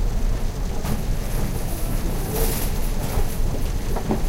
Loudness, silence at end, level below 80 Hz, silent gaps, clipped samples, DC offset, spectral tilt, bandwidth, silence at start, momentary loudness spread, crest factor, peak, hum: -27 LUFS; 0 s; -22 dBFS; none; under 0.1%; under 0.1%; -5.5 dB/octave; 16 kHz; 0 s; 4 LU; 14 dB; -6 dBFS; none